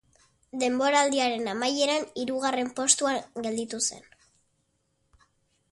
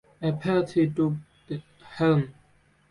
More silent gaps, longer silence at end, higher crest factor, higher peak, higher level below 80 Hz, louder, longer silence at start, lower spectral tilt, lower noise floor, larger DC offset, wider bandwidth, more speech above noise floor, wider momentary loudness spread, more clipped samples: neither; first, 1.7 s vs 0.6 s; first, 22 dB vs 16 dB; first, -6 dBFS vs -12 dBFS; second, -70 dBFS vs -60 dBFS; about the same, -26 LUFS vs -26 LUFS; first, 0.55 s vs 0.2 s; second, -1 dB/octave vs -8.5 dB/octave; first, -73 dBFS vs -62 dBFS; neither; about the same, 11.5 kHz vs 11 kHz; first, 47 dB vs 38 dB; second, 9 LU vs 14 LU; neither